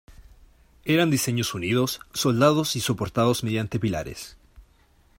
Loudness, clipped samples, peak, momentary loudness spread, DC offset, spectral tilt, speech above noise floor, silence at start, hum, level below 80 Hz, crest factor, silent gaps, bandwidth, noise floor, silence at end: -24 LUFS; under 0.1%; -6 dBFS; 13 LU; under 0.1%; -5 dB/octave; 36 dB; 0.1 s; none; -52 dBFS; 18 dB; none; 16.5 kHz; -59 dBFS; 0.6 s